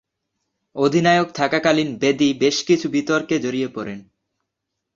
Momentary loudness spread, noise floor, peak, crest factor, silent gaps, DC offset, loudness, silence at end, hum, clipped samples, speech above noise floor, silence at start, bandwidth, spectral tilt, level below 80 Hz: 12 LU; -80 dBFS; -2 dBFS; 18 dB; none; under 0.1%; -19 LUFS; 0.95 s; none; under 0.1%; 61 dB; 0.75 s; 7.6 kHz; -5 dB/octave; -60 dBFS